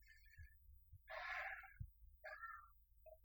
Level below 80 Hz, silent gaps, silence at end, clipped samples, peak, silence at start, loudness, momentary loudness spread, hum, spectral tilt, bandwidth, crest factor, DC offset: -68 dBFS; none; 0 s; under 0.1%; -38 dBFS; 0 s; -53 LUFS; 20 LU; none; -4.5 dB/octave; over 20 kHz; 20 dB; under 0.1%